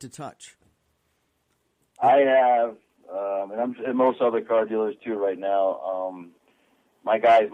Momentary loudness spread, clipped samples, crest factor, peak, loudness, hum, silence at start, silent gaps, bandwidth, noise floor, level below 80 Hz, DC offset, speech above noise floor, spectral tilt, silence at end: 17 LU; under 0.1%; 16 dB; -8 dBFS; -23 LUFS; none; 0 s; none; 10 kHz; -71 dBFS; -76 dBFS; under 0.1%; 49 dB; -5.5 dB/octave; 0 s